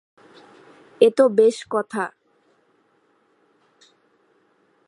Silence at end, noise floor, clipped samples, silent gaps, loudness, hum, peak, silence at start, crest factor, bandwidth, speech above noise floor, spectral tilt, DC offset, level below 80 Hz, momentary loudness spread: 2.8 s; -63 dBFS; under 0.1%; none; -19 LUFS; none; -2 dBFS; 1 s; 22 dB; 11.5 kHz; 45 dB; -5 dB/octave; under 0.1%; -80 dBFS; 13 LU